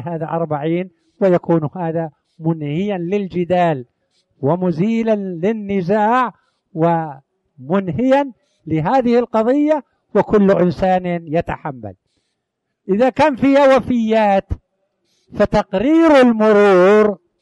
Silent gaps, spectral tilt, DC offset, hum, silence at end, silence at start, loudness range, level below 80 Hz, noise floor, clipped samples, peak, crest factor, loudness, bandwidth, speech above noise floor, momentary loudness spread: none; -8 dB/octave; under 0.1%; none; 0.25 s; 0 s; 5 LU; -44 dBFS; -75 dBFS; under 0.1%; -2 dBFS; 14 dB; -16 LUFS; 11 kHz; 60 dB; 13 LU